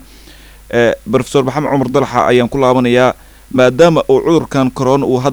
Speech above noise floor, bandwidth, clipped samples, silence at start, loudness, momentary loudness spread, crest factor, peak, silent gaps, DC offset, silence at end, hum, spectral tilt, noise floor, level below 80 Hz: 26 dB; over 20 kHz; under 0.1%; 0.7 s; -12 LUFS; 6 LU; 12 dB; 0 dBFS; none; under 0.1%; 0 s; none; -6 dB/octave; -38 dBFS; -40 dBFS